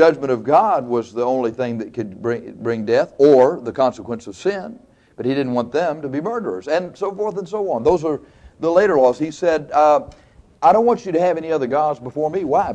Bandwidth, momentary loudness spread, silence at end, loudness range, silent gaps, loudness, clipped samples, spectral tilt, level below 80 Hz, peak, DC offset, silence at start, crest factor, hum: 8.8 kHz; 11 LU; 0 s; 6 LU; none; -19 LUFS; under 0.1%; -6.5 dB/octave; -52 dBFS; -2 dBFS; under 0.1%; 0 s; 16 dB; none